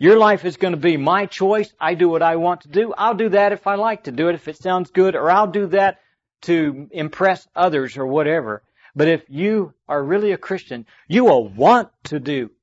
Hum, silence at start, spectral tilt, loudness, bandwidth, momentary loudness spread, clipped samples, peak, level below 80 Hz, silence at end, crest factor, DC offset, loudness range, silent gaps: none; 0 s; -7 dB/octave; -18 LUFS; 8 kHz; 11 LU; under 0.1%; -4 dBFS; -64 dBFS; 0.15 s; 14 dB; under 0.1%; 2 LU; none